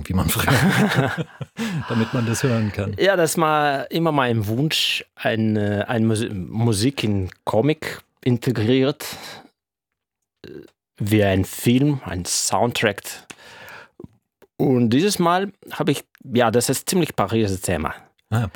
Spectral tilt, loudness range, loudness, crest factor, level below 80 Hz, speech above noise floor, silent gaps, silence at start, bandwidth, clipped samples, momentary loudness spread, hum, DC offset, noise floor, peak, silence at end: -5 dB/octave; 4 LU; -21 LUFS; 20 dB; -50 dBFS; 63 dB; none; 0 s; over 20 kHz; under 0.1%; 14 LU; none; under 0.1%; -84 dBFS; -2 dBFS; 0.05 s